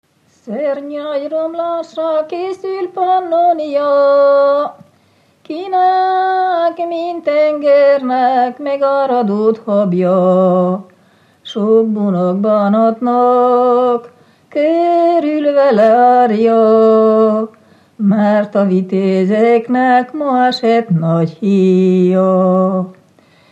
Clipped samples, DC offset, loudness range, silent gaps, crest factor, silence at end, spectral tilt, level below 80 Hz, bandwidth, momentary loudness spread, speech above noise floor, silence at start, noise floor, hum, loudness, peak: under 0.1%; under 0.1%; 3 LU; none; 12 dB; 0.6 s; -8.5 dB/octave; -74 dBFS; 8.2 kHz; 10 LU; 41 dB; 0.45 s; -53 dBFS; none; -13 LUFS; 0 dBFS